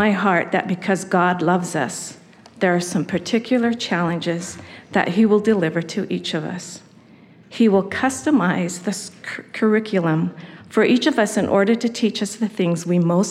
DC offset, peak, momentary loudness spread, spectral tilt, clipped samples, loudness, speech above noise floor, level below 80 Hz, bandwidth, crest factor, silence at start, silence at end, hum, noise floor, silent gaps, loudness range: under 0.1%; -4 dBFS; 13 LU; -5.5 dB/octave; under 0.1%; -20 LUFS; 28 dB; -64 dBFS; 13.5 kHz; 16 dB; 0 s; 0 s; none; -48 dBFS; none; 3 LU